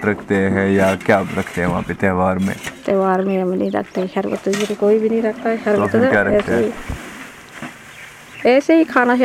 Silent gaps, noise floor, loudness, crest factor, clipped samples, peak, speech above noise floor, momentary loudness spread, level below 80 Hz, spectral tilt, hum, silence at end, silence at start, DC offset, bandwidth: none; -38 dBFS; -17 LUFS; 18 dB; under 0.1%; 0 dBFS; 22 dB; 19 LU; -44 dBFS; -6.5 dB/octave; none; 0 s; 0 s; under 0.1%; 15.5 kHz